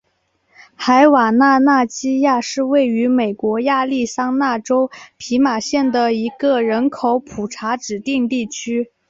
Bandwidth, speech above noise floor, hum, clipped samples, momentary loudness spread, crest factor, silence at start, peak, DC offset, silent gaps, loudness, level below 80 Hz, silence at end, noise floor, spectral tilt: 7.8 kHz; 49 dB; none; under 0.1%; 10 LU; 16 dB; 0.8 s; 0 dBFS; under 0.1%; none; -16 LUFS; -58 dBFS; 0.25 s; -65 dBFS; -4 dB/octave